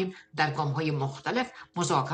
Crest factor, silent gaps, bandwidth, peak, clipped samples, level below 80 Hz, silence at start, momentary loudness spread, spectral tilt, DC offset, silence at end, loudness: 18 dB; none; 9.4 kHz; -10 dBFS; under 0.1%; -68 dBFS; 0 s; 6 LU; -5 dB/octave; under 0.1%; 0 s; -30 LUFS